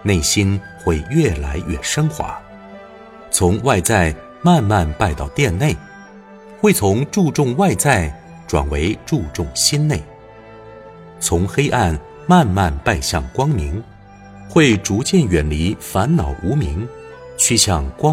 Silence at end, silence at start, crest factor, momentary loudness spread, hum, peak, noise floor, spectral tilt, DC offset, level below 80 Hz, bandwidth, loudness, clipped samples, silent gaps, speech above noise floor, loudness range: 0 s; 0 s; 18 dB; 11 LU; none; 0 dBFS; -40 dBFS; -4.5 dB/octave; under 0.1%; -30 dBFS; 16.5 kHz; -17 LUFS; under 0.1%; none; 23 dB; 3 LU